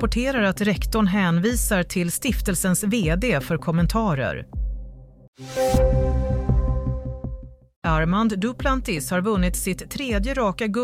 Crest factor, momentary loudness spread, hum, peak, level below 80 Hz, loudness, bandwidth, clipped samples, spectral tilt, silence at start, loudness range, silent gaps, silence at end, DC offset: 14 dB; 10 LU; none; -8 dBFS; -28 dBFS; -23 LUFS; 16 kHz; under 0.1%; -5.5 dB/octave; 0 s; 3 LU; 5.28-5.33 s, 7.76-7.82 s; 0 s; under 0.1%